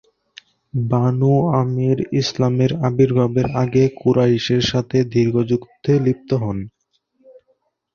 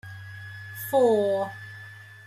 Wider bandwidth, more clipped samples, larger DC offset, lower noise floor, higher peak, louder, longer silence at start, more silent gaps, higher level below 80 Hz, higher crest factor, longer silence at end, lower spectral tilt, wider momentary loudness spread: second, 7 kHz vs 16 kHz; neither; neither; first, -65 dBFS vs -45 dBFS; first, -4 dBFS vs -10 dBFS; first, -18 LUFS vs -24 LUFS; first, 0.75 s vs 0.05 s; neither; first, -48 dBFS vs -70 dBFS; about the same, 16 dB vs 18 dB; first, 1.25 s vs 0.1 s; first, -7.5 dB/octave vs -5.5 dB/octave; second, 6 LU vs 20 LU